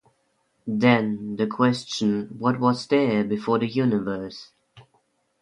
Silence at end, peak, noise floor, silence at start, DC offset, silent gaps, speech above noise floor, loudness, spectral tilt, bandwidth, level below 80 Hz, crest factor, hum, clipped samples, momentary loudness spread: 0.6 s; -4 dBFS; -69 dBFS; 0.65 s; under 0.1%; none; 47 dB; -23 LUFS; -6.5 dB/octave; 10.5 kHz; -64 dBFS; 20 dB; none; under 0.1%; 11 LU